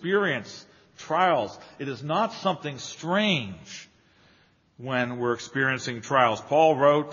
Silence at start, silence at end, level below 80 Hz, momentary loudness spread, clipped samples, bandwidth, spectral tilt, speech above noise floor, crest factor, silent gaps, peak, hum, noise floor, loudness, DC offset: 0 s; 0 s; -70 dBFS; 19 LU; under 0.1%; 7.2 kHz; -3 dB/octave; 36 dB; 22 dB; none; -6 dBFS; none; -61 dBFS; -25 LUFS; under 0.1%